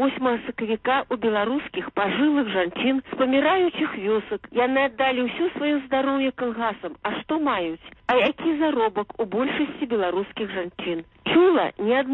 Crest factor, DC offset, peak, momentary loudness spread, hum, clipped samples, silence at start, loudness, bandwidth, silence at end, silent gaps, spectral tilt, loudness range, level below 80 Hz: 14 dB; under 0.1%; -8 dBFS; 9 LU; none; under 0.1%; 0 s; -23 LUFS; 4.1 kHz; 0 s; none; -7.5 dB/octave; 2 LU; -58 dBFS